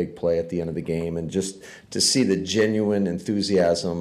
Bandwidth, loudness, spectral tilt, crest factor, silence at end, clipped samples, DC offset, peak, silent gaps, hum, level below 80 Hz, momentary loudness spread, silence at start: 15.5 kHz; -23 LUFS; -4.5 dB/octave; 14 dB; 0 s; under 0.1%; under 0.1%; -10 dBFS; none; none; -56 dBFS; 8 LU; 0 s